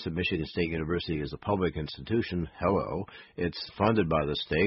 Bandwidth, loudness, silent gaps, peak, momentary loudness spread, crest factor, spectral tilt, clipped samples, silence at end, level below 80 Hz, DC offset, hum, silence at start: 5.8 kHz; -30 LUFS; none; -10 dBFS; 8 LU; 20 dB; -10.5 dB/octave; under 0.1%; 0 s; -46 dBFS; under 0.1%; none; 0 s